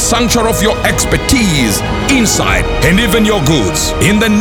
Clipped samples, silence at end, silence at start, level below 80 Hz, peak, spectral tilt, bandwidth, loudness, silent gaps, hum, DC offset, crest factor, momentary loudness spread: under 0.1%; 0 s; 0 s; -22 dBFS; 0 dBFS; -4 dB/octave; over 20 kHz; -11 LUFS; none; none; under 0.1%; 10 dB; 3 LU